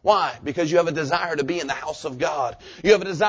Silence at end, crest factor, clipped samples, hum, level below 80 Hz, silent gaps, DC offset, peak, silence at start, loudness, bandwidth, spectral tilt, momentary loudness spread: 0 s; 20 dB; under 0.1%; none; -54 dBFS; none; under 0.1%; -2 dBFS; 0.05 s; -23 LUFS; 8 kHz; -4.5 dB/octave; 9 LU